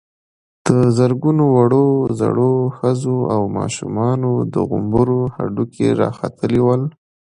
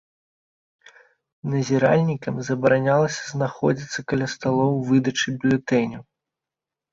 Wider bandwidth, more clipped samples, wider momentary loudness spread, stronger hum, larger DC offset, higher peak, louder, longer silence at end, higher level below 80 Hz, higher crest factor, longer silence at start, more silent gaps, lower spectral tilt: first, 11 kHz vs 7.8 kHz; neither; about the same, 8 LU vs 9 LU; neither; neither; first, 0 dBFS vs -4 dBFS; first, -17 LUFS vs -22 LUFS; second, 0.45 s vs 0.9 s; first, -46 dBFS vs -60 dBFS; about the same, 16 dB vs 18 dB; second, 0.65 s vs 1.45 s; neither; first, -8 dB/octave vs -6 dB/octave